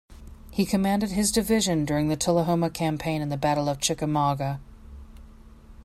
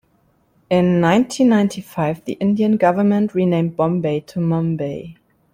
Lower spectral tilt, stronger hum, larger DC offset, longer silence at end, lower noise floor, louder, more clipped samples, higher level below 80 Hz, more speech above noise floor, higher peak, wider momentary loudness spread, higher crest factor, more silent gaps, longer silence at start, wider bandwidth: second, -5 dB/octave vs -7.5 dB/octave; neither; neither; second, 0 s vs 0.4 s; second, -47 dBFS vs -60 dBFS; second, -25 LUFS vs -18 LUFS; neither; first, -46 dBFS vs -56 dBFS; second, 23 dB vs 43 dB; second, -10 dBFS vs -2 dBFS; about the same, 6 LU vs 8 LU; about the same, 16 dB vs 16 dB; neither; second, 0.1 s vs 0.7 s; about the same, 16 kHz vs 15.5 kHz